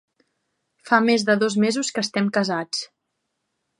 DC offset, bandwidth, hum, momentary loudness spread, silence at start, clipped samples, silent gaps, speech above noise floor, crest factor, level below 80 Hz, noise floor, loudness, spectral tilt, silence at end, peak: under 0.1%; 11.5 kHz; none; 10 LU; 0.85 s; under 0.1%; none; 57 dB; 22 dB; -74 dBFS; -77 dBFS; -21 LUFS; -4 dB/octave; 0.95 s; -2 dBFS